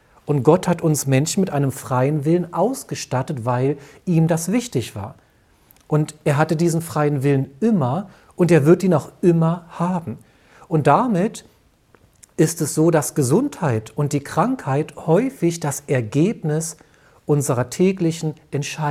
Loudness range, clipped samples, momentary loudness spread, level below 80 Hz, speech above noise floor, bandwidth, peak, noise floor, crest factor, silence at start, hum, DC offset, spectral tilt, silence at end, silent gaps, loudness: 4 LU; under 0.1%; 10 LU; -56 dBFS; 36 dB; 15.5 kHz; -2 dBFS; -55 dBFS; 18 dB; 0.25 s; none; under 0.1%; -6.5 dB/octave; 0 s; none; -20 LUFS